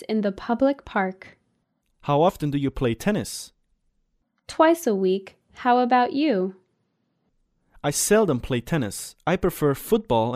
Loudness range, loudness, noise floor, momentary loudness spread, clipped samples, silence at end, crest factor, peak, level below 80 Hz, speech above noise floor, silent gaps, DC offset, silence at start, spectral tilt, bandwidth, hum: 3 LU; -23 LUFS; -72 dBFS; 11 LU; under 0.1%; 0 s; 18 dB; -6 dBFS; -48 dBFS; 50 dB; none; under 0.1%; 0 s; -5 dB/octave; 15.5 kHz; none